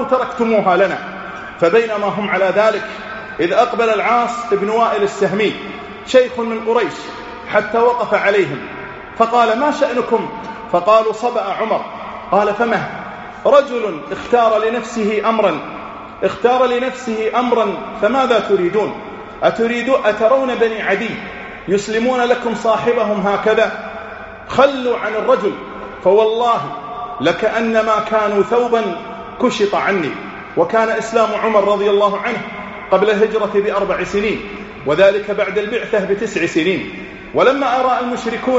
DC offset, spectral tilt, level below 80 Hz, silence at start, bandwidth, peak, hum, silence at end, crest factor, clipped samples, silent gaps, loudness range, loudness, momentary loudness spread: under 0.1%; -3 dB/octave; -50 dBFS; 0 s; 8 kHz; 0 dBFS; none; 0 s; 16 dB; under 0.1%; none; 1 LU; -16 LUFS; 14 LU